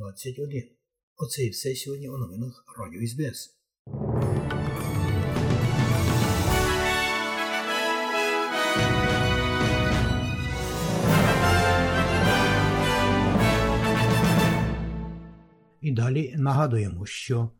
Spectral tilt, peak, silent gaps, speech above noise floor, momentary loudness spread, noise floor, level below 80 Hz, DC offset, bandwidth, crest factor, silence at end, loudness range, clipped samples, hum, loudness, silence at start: -5.5 dB/octave; -10 dBFS; 1.03-1.16 s, 3.79-3.85 s; 25 dB; 13 LU; -53 dBFS; -38 dBFS; under 0.1%; 17.5 kHz; 16 dB; 0.1 s; 9 LU; under 0.1%; none; -24 LUFS; 0 s